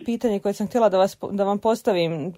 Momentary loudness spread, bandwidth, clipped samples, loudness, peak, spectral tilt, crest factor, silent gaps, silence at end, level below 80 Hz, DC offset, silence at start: 5 LU; 16 kHz; under 0.1%; -22 LUFS; -6 dBFS; -6 dB/octave; 16 dB; none; 0.05 s; -60 dBFS; under 0.1%; 0 s